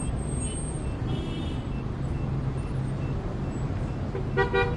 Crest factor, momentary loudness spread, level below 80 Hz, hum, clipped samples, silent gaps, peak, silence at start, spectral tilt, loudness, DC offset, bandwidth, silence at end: 20 dB; 5 LU; -36 dBFS; none; under 0.1%; none; -10 dBFS; 0 s; -6 dB/octave; -30 LUFS; under 0.1%; 10.5 kHz; 0 s